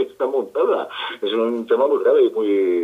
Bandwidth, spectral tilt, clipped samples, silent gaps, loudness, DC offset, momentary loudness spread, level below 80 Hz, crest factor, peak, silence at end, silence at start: 5 kHz; -5.5 dB/octave; under 0.1%; none; -19 LUFS; under 0.1%; 7 LU; -74 dBFS; 12 dB; -6 dBFS; 0 s; 0 s